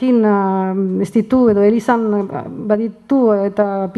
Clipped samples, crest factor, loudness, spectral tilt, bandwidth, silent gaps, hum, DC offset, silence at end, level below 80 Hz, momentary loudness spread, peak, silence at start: under 0.1%; 14 dB; -16 LUFS; -8.5 dB/octave; 11.5 kHz; none; none; under 0.1%; 0 s; -52 dBFS; 6 LU; 0 dBFS; 0 s